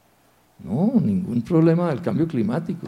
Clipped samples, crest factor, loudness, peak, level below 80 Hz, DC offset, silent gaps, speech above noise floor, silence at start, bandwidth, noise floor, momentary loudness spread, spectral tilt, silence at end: under 0.1%; 16 dB; -21 LUFS; -6 dBFS; -56 dBFS; under 0.1%; none; 38 dB; 0.6 s; 10 kHz; -59 dBFS; 7 LU; -9.5 dB/octave; 0 s